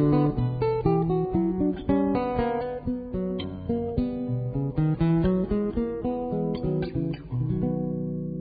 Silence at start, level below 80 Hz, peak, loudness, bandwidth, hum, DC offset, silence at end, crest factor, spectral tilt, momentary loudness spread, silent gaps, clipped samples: 0 s; -42 dBFS; -10 dBFS; -27 LUFS; 4.9 kHz; none; under 0.1%; 0 s; 16 dB; -13 dB/octave; 7 LU; none; under 0.1%